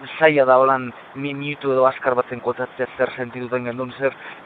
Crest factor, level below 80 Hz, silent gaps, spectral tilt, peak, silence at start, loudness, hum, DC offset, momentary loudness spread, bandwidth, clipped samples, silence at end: 20 dB; -66 dBFS; none; -8.5 dB/octave; 0 dBFS; 0 s; -20 LUFS; none; under 0.1%; 13 LU; 4.6 kHz; under 0.1%; 0 s